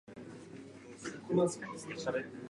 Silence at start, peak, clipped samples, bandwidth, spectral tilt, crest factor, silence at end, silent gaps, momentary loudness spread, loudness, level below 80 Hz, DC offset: 0.05 s; -18 dBFS; under 0.1%; 11.5 kHz; -5.5 dB/octave; 20 dB; 0 s; none; 19 LU; -37 LUFS; -72 dBFS; under 0.1%